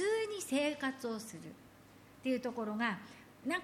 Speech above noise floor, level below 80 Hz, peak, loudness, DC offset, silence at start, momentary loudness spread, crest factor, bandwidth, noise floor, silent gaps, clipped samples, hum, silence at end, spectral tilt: 22 dB; -76 dBFS; -22 dBFS; -38 LUFS; under 0.1%; 0 s; 17 LU; 18 dB; 17 kHz; -59 dBFS; none; under 0.1%; none; 0 s; -4 dB/octave